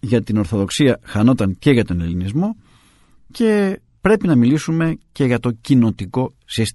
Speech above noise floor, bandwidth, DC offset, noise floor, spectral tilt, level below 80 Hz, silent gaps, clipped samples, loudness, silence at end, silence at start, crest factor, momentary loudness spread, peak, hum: 35 dB; 12 kHz; under 0.1%; -52 dBFS; -6.5 dB/octave; -42 dBFS; none; under 0.1%; -18 LUFS; 0.05 s; 0.05 s; 16 dB; 7 LU; 0 dBFS; none